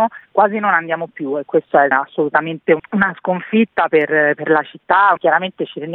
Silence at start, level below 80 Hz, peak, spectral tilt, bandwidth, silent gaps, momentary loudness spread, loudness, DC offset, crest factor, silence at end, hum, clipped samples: 0 s; -62 dBFS; 0 dBFS; -9.5 dB/octave; 4.2 kHz; none; 9 LU; -16 LUFS; under 0.1%; 16 dB; 0 s; none; under 0.1%